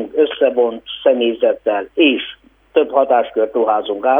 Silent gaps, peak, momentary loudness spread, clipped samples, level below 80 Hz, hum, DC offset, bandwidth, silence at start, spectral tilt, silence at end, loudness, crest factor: none; 0 dBFS; 5 LU; under 0.1%; -58 dBFS; 50 Hz at -60 dBFS; under 0.1%; 3.8 kHz; 0 s; -6.5 dB/octave; 0 s; -16 LUFS; 14 dB